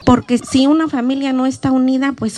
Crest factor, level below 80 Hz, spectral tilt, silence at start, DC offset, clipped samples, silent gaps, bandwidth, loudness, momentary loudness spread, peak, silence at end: 14 dB; -46 dBFS; -5.5 dB/octave; 0 s; under 0.1%; under 0.1%; none; 11.5 kHz; -15 LUFS; 4 LU; 0 dBFS; 0 s